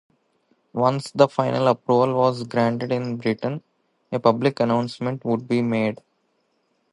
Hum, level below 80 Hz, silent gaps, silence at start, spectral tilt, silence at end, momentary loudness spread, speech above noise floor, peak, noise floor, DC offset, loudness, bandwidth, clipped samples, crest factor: none; -66 dBFS; none; 0.75 s; -7 dB/octave; 0.95 s; 8 LU; 48 dB; -2 dBFS; -69 dBFS; under 0.1%; -22 LUFS; 11.5 kHz; under 0.1%; 20 dB